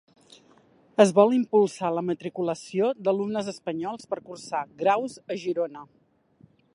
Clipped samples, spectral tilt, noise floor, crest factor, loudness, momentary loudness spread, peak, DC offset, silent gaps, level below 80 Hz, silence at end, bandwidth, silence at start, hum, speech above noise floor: under 0.1%; -6 dB/octave; -59 dBFS; 22 dB; -26 LUFS; 13 LU; -4 dBFS; under 0.1%; none; -74 dBFS; 0.9 s; 11.5 kHz; 1 s; none; 34 dB